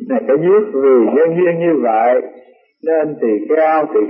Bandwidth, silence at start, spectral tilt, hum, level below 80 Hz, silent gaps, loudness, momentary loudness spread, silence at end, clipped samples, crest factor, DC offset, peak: 3.3 kHz; 0 s; -12.5 dB/octave; none; -74 dBFS; none; -14 LUFS; 6 LU; 0 s; under 0.1%; 12 dB; under 0.1%; -2 dBFS